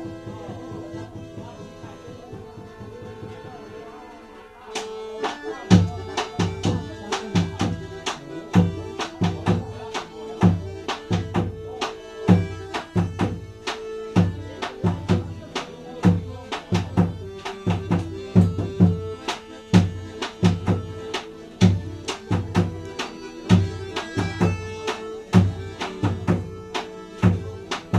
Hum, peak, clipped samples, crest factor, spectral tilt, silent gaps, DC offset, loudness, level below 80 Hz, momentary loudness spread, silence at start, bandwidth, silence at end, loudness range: none; -2 dBFS; under 0.1%; 22 dB; -6.5 dB/octave; none; under 0.1%; -24 LUFS; -46 dBFS; 18 LU; 0 s; 10.5 kHz; 0 s; 12 LU